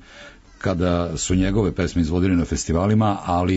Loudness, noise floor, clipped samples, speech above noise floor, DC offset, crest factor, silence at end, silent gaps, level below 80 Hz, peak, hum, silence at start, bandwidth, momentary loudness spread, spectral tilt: -21 LUFS; -44 dBFS; under 0.1%; 24 dB; under 0.1%; 12 dB; 0 s; none; -34 dBFS; -10 dBFS; none; 0.1 s; 8 kHz; 4 LU; -6 dB/octave